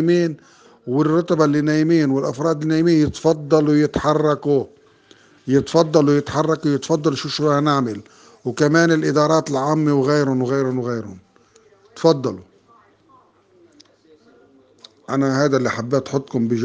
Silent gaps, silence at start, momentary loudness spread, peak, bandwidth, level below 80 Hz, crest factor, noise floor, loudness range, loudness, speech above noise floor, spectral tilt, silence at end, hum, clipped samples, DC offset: none; 0 s; 10 LU; 0 dBFS; 9.4 kHz; -54 dBFS; 18 dB; -54 dBFS; 9 LU; -18 LUFS; 36 dB; -6.5 dB/octave; 0 s; none; under 0.1%; under 0.1%